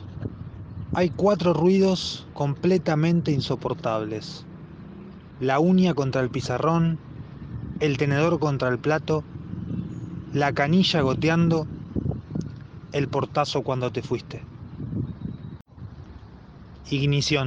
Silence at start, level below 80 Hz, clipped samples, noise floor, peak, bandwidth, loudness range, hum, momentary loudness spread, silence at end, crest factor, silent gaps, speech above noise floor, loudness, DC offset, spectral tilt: 0 s; -48 dBFS; under 0.1%; -45 dBFS; -6 dBFS; 8 kHz; 6 LU; none; 21 LU; 0 s; 18 dB; 15.61-15.65 s; 22 dB; -24 LUFS; under 0.1%; -6.5 dB/octave